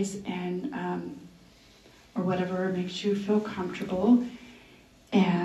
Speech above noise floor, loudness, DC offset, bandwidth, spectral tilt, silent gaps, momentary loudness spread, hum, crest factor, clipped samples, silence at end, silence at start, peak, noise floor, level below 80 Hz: 28 dB; -29 LUFS; under 0.1%; 12 kHz; -6.5 dB/octave; none; 15 LU; none; 18 dB; under 0.1%; 0 s; 0 s; -12 dBFS; -56 dBFS; -62 dBFS